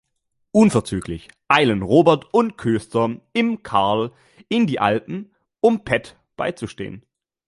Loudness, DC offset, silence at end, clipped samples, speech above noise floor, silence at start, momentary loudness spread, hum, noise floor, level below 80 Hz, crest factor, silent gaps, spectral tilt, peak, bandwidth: -19 LUFS; under 0.1%; 0.5 s; under 0.1%; 53 dB; 0.55 s; 15 LU; none; -72 dBFS; -50 dBFS; 20 dB; none; -6 dB/octave; 0 dBFS; 11.5 kHz